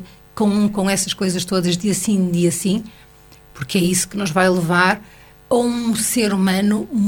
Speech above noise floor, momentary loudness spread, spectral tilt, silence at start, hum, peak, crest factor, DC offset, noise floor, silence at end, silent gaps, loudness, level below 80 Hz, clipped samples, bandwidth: 28 dB; 6 LU; -4.5 dB/octave; 0 s; none; 0 dBFS; 18 dB; under 0.1%; -46 dBFS; 0 s; none; -18 LUFS; -48 dBFS; under 0.1%; 19 kHz